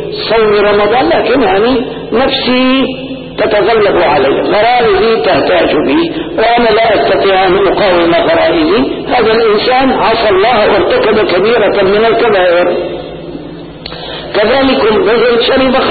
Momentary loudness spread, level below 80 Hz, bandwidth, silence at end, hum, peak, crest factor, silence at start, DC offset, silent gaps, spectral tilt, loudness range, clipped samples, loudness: 8 LU; -34 dBFS; 4.8 kHz; 0 s; none; -2 dBFS; 8 dB; 0 s; under 0.1%; none; -11 dB/octave; 3 LU; under 0.1%; -9 LUFS